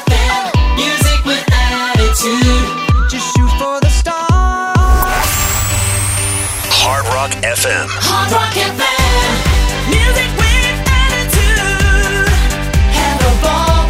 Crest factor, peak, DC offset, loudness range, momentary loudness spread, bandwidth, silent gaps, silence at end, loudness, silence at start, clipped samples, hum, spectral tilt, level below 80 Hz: 12 dB; 0 dBFS; under 0.1%; 1 LU; 3 LU; 16.5 kHz; none; 0 s; -12 LUFS; 0 s; under 0.1%; none; -3.5 dB/octave; -16 dBFS